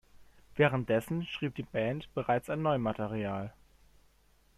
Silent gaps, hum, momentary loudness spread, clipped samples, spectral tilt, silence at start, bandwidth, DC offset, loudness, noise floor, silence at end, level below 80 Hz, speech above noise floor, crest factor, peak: none; none; 9 LU; under 0.1%; -7 dB/octave; 0.15 s; 14 kHz; under 0.1%; -32 LUFS; -66 dBFS; 1.1 s; -60 dBFS; 34 dB; 20 dB; -12 dBFS